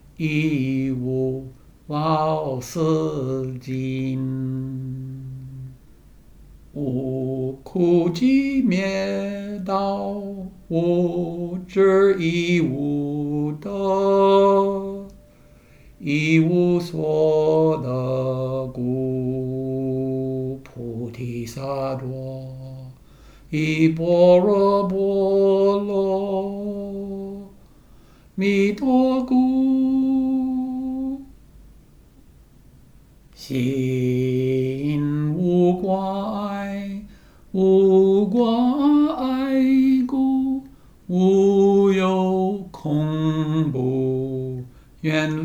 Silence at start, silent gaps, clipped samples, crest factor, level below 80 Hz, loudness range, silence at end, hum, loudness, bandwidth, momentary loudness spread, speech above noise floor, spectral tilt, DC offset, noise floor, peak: 0.2 s; none; under 0.1%; 16 dB; -50 dBFS; 9 LU; 0 s; none; -21 LUFS; 14 kHz; 14 LU; 30 dB; -8 dB/octave; under 0.1%; -50 dBFS; -4 dBFS